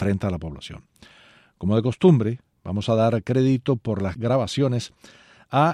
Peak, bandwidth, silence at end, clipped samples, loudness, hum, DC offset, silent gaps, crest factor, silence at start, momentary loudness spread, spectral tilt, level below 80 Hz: -4 dBFS; 11 kHz; 0 s; under 0.1%; -22 LUFS; none; under 0.1%; none; 18 dB; 0 s; 17 LU; -7.5 dB/octave; -50 dBFS